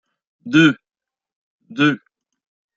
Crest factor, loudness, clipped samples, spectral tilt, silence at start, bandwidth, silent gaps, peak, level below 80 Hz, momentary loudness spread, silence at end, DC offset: 20 dB; -16 LUFS; under 0.1%; -5.5 dB/octave; 0.45 s; 7.6 kHz; 1.36-1.59 s; -2 dBFS; -64 dBFS; 17 LU; 0.8 s; under 0.1%